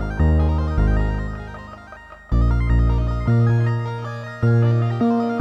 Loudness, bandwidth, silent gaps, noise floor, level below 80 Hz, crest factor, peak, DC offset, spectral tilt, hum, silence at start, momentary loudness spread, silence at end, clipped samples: -20 LUFS; 6 kHz; none; -40 dBFS; -24 dBFS; 12 dB; -8 dBFS; under 0.1%; -9.5 dB/octave; none; 0 s; 17 LU; 0 s; under 0.1%